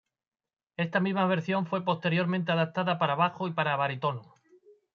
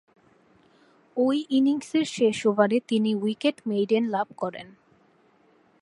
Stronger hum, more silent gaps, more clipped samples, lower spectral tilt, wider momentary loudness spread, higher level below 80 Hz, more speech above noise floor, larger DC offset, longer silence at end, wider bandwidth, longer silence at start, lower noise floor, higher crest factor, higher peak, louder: neither; neither; neither; first, -8 dB/octave vs -5.5 dB/octave; second, 6 LU vs 9 LU; about the same, -76 dBFS vs -76 dBFS; second, 32 dB vs 37 dB; neither; second, 0.7 s vs 1.15 s; second, 6.6 kHz vs 11.5 kHz; second, 0.8 s vs 1.15 s; about the same, -60 dBFS vs -61 dBFS; about the same, 18 dB vs 20 dB; second, -12 dBFS vs -6 dBFS; second, -28 LUFS vs -25 LUFS